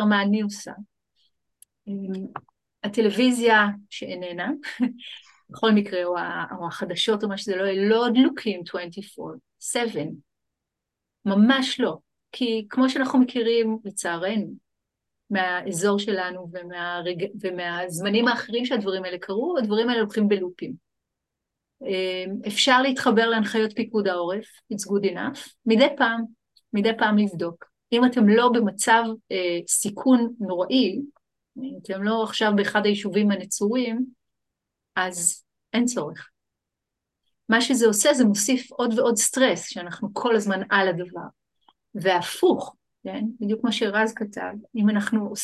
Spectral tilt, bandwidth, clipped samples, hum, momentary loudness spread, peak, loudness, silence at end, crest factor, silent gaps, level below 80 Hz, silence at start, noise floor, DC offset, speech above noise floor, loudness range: -4 dB/octave; 12.5 kHz; under 0.1%; none; 16 LU; -4 dBFS; -23 LUFS; 0 s; 20 dB; none; -72 dBFS; 0 s; -84 dBFS; under 0.1%; 61 dB; 6 LU